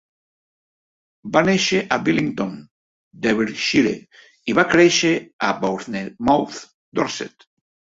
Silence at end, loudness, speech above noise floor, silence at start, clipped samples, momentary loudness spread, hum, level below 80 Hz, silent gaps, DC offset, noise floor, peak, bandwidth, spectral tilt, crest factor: 0.65 s; -19 LUFS; over 71 dB; 1.25 s; under 0.1%; 16 LU; none; -56 dBFS; 2.71-3.11 s, 5.33-5.39 s, 6.74-6.92 s; under 0.1%; under -90 dBFS; -2 dBFS; 7.8 kHz; -4 dB/octave; 20 dB